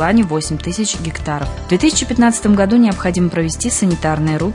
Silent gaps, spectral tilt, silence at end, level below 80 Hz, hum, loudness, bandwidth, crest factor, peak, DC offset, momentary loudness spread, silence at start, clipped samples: none; -5 dB/octave; 0 s; -32 dBFS; none; -15 LUFS; 11 kHz; 12 dB; -2 dBFS; under 0.1%; 9 LU; 0 s; under 0.1%